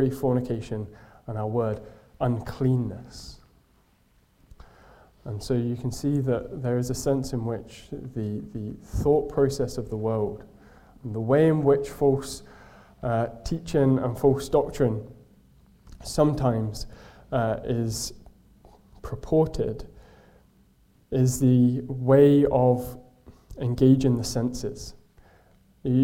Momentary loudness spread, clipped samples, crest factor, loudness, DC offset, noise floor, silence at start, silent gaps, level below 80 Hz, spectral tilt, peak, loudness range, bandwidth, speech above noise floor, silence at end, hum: 19 LU; under 0.1%; 20 dB; -25 LUFS; under 0.1%; -62 dBFS; 0 s; none; -46 dBFS; -7 dB/octave; -6 dBFS; 9 LU; 16 kHz; 38 dB; 0 s; none